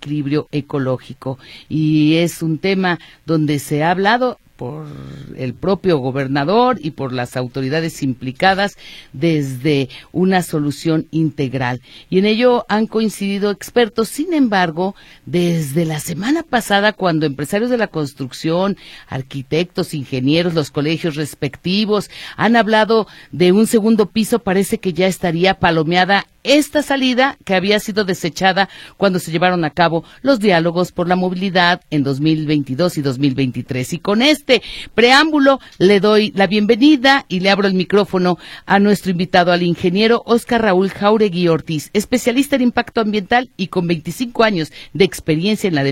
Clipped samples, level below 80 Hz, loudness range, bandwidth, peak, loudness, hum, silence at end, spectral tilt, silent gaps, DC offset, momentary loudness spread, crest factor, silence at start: under 0.1%; -48 dBFS; 5 LU; 16.5 kHz; 0 dBFS; -16 LUFS; none; 0 s; -5.5 dB/octave; none; under 0.1%; 9 LU; 16 dB; 0 s